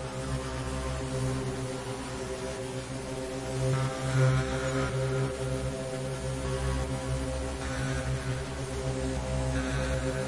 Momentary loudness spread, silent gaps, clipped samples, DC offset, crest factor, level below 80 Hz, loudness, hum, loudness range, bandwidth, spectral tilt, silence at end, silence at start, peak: 6 LU; none; under 0.1%; under 0.1%; 18 dB; -40 dBFS; -32 LUFS; none; 4 LU; 11.5 kHz; -5.5 dB/octave; 0 s; 0 s; -14 dBFS